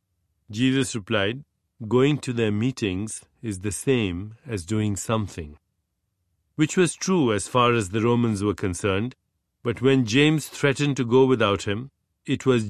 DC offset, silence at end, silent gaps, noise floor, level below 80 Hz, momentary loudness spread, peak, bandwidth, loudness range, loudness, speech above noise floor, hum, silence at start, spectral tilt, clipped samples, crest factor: under 0.1%; 0 s; none; -76 dBFS; -48 dBFS; 14 LU; -6 dBFS; 13.5 kHz; 5 LU; -23 LUFS; 53 dB; none; 0.5 s; -5.5 dB/octave; under 0.1%; 18 dB